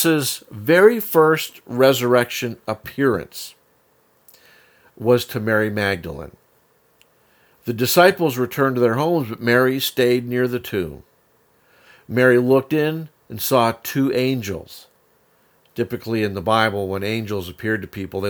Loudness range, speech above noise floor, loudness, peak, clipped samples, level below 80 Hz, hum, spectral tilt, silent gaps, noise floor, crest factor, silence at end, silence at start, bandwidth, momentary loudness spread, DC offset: 6 LU; 41 dB; -19 LUFS; 0 dBFS; under 0.1%; -56 dBFS; none; -5 dB/octave; none; -60 dBFS; 20 dB; 0 s; 0 s; over 20 kHz; 15 LU; under 0.1%